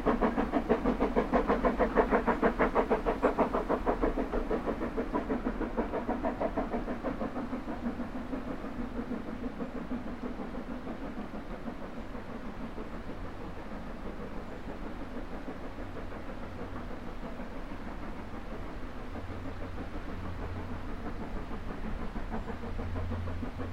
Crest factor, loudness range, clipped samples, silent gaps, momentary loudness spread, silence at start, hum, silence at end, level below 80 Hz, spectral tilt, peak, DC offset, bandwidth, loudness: 22 dB; 13 LU; under 0.1%; none; 14 LU; 0 s; none; 0 s; -42 dBFS; -7.5 dB/octave; -12 dBFS; 0.6%; 13 kHz; -35 LUFS